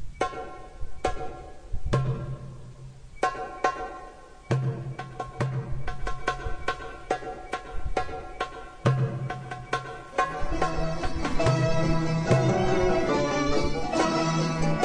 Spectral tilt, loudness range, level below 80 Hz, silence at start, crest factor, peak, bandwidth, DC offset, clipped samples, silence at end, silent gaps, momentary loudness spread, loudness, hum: -6 dB/octave; 8 LU; -38 dBFS; 0 s; 18 dB; -8 dBFS; 10 kHz; under 0.1%; under 0.1%; 0 s; none; 15 LU; -29 LUFS; none